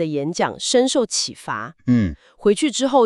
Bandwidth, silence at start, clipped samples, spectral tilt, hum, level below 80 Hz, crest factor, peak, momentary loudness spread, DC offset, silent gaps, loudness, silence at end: 12 kHz; 0 s; under 0.1%; -4 dB/octave; none; -46 dBFS; 14 dB; -4 dBFS; 9 LU; under 0.1%; none; -20 LUFS; 0 s